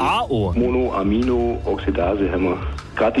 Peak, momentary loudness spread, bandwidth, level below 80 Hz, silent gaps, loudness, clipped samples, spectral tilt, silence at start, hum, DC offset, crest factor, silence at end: -10 dBFS; 4 LU; 11.5 kHz; -30 dBFS; none; -21 LUFS; under 0.1%; -7.5 dB/octave; 0 s; none; 0.1%; 10 dB; 0 s